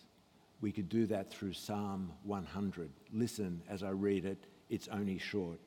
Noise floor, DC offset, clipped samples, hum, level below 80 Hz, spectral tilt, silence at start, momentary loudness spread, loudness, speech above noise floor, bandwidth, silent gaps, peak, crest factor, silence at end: -67 dBFS; under 0.1%; under 0.1%; none; -70 dBFS; -6.5 dB/octave; 0 s; 8 LU; -40 LUFS; 28 dB; 17.5 kHz; none; -24 dBFS; 16 dB; 0 s